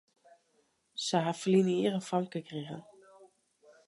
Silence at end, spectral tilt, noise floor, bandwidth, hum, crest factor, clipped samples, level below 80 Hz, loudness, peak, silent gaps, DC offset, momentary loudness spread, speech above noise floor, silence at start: 0.65 s; -5.5 dB/octave; -73 dBFS; 11.5 kHz; none; 18 dB; under 0.1%; -82 dBFS; -31 LUFS; -16 dBFS; none; under 0.1%; 17 LU; 43 dB; 0.95 s